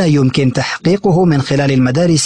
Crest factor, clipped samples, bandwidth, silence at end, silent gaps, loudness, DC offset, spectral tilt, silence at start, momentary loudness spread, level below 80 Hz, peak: 10 dB; under 0.1%; 10.5 kHz; 0 s; none; -13 LUFS; 0.6%; -6 dB/octave; 0 s; 3 LU; -42 dBFS; -2 dBFS